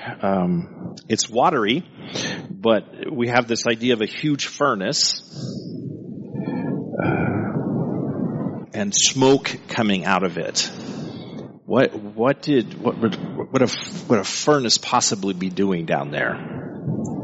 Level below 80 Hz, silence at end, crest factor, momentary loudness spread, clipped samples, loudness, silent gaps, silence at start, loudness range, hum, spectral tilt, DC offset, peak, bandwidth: -58 dBFS; 0 s; 20 dB; 14 LU; under 0.1%; -21 LUFS; none; 0 s; 3 LU; none; -4 dB/octave; under 0.1%; -2 dBFS; 8 kHz